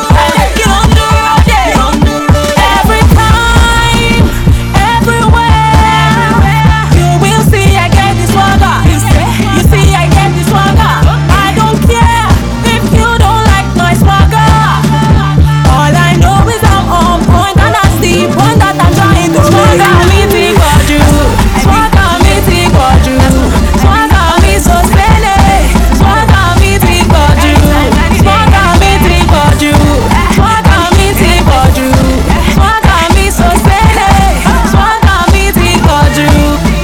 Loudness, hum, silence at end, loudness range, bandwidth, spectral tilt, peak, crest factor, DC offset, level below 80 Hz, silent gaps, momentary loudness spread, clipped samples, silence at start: -7 LUFS; none; 0 s; 1 LU; 18 kHz; -5.5 dB/octave; 0 dBFS; 6 dB; under 0.1%; -12 dBFS; none; 2 LU; 4%; 0 s